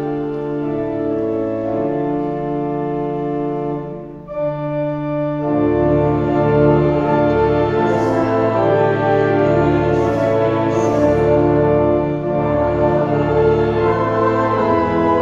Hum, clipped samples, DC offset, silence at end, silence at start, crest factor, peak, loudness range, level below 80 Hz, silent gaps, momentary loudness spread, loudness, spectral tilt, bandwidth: none; under 0.1%; under 0.1%; 0 s; 0 s; 14 dB; -2 dBFS; 6 LU; -38 dBFS; none; 7 LU; -17 LUFS; -8.5 dB/octave; 7.6 kHz